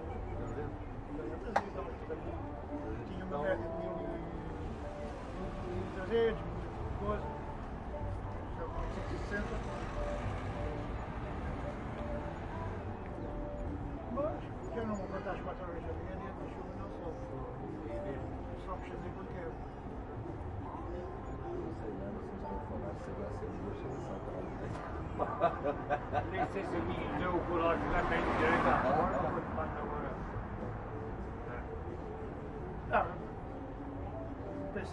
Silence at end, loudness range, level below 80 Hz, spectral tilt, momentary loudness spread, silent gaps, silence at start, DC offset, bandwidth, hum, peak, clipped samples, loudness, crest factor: 0 s; 10 LU; -46 dBFS; -7.5 dB/octave; 10 LU; none; 0 s; under 0.1%; 11 kHz; none; -14 dBFS; under 0.1%; -39 LUFS; 24 dB